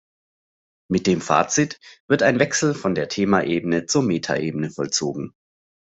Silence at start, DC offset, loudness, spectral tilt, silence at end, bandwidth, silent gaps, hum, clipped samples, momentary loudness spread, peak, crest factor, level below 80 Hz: 0.9 s; under 0.1%; -21 LUFS; -4.5 dB/octave; 0.6 s; 8.2 kHz; 2.00-2.08 s; none; under 0.1%; 8 LU; -2 dBFS; 20 dB; -60 dBFS